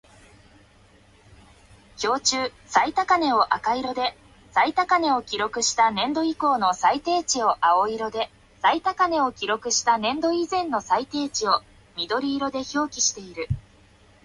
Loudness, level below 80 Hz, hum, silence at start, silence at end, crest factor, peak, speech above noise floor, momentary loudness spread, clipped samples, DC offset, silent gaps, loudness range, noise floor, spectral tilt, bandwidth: -23 LUFS; -54 dBFS; none; 2 s; 0.65 s; 20 dB; -4 dBFS; 32 dB; 8 LU; under 0.1%; under 0.1%; none; 3 LU; -55 dBFS; -2.5 dB/octave; 11.5 kHz